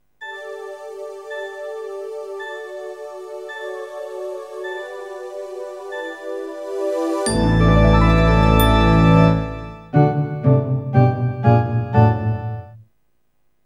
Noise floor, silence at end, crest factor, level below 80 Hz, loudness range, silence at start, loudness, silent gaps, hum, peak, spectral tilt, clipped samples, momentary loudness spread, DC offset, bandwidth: -70 dBFS; 0.85 s; 18 dB; -28 dBFS; 15 LU; 0.2 s; -17 LUFS; none; none; 0 dBFS; -7 dB/octave; under 0.1%; 19 LU; under 0.1%; 15 kHz